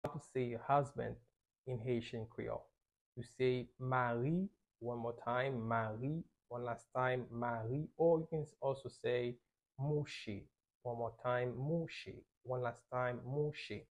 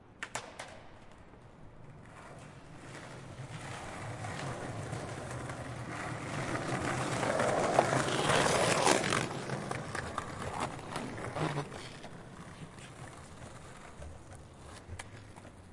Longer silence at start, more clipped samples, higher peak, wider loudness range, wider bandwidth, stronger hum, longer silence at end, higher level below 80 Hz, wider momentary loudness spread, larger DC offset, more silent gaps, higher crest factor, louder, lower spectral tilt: about the same, 0.05 s vs 0 s; neither; second, -22 dBFS vs -10 dBFS; second, 3 LU vs 19 LU; about the same, 10.5 kHz vs 11.5 kHz; neither; about the same, 0.1 s vs 0 s; second, -68 dBFS vs -60 dBFS; second, 13 LU vs 23 LU; neither; first, 1.58-1.64 s, 3.01-3.12 s, 10.75-10.81 s, 12.37-12.41 s vs none; second, 20 dB vs 26 dB; second, -40 LUFS vs -34 LUFS; first, -7.5 dB/octave vs -4 dB/octave